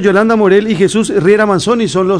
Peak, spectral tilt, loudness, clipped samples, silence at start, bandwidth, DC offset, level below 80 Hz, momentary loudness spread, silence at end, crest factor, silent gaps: 0 dBFS; -5.5 dB/octave; -10 LUFS; 0.7%; 0 s; 11 kHz; under 0.1%; -44 dBFS; 3 LU; 0 s; 10 dB; none